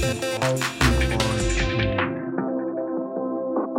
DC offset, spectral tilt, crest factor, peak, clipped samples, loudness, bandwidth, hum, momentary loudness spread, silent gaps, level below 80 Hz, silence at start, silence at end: under 0.1%; -5 dB/octave; 16 dB; -6 dBFS; under 0.1%; -24 LUFS; 17 kHz; none; 7 LU; none; -32 dBFS; 0 s; 0 s